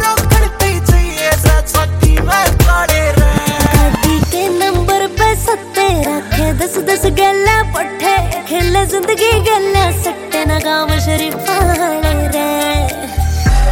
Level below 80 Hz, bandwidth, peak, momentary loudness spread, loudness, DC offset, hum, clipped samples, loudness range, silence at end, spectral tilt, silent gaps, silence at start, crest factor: -18 dBFS; 17 kHz; 0 dBFS; 5 LU; -13 LUFS; under 0.1%; none; under 0.1%; 2 LU; 0 s; -4.5 dB/octave; none; 0 s; 12 dB